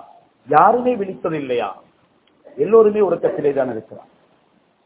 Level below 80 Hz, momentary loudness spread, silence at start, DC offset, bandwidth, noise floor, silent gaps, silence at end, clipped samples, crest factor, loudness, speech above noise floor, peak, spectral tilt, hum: -60 dBFS; 12 LU; 0.5 s; under 0.1%; 4 kHz; -59 dBFS; none; 0.9 s; under 0.1%; 18 dB; -17 LUFS; 42 dB; 0 dBFS; -10.5 dB/octave; none